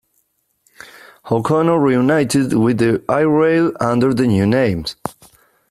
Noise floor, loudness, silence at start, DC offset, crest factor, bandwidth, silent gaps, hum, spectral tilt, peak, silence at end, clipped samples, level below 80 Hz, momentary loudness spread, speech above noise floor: -65 dBFS; -16 LUFS; 1.25 s; under 0.1%; 14 dB; 14 kHz; none; none; -6.5 dB/octave; -2 dBFS; 0.6 s; under 0.1%; -50 dBFS; 8 LU; 50 dB